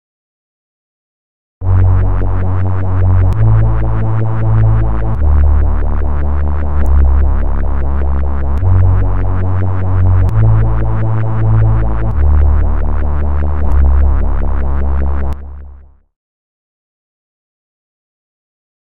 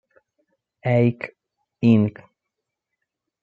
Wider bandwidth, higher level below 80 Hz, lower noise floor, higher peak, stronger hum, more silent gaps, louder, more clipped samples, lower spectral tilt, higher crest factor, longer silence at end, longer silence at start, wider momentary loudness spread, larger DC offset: second, 3.1 kHz vs 4.8 kHz; first, -14 dBFS vs -68 dBFS; second, -36 dBFS vs -82 dBFS; first, 0 dBFS vs -4 dBFS; neither; neither; first, -14 LUFS vs -20 LUFS; neither; about the same, -11 dB/octave vs -10 dB/octave; second, 12 dB vs 20 dB; first, 2.7 s vs 1.3 s; first, 1.6 s vs 0.85 s; second, 6 LU vs 15 LU; first, 20% vs under 0.1%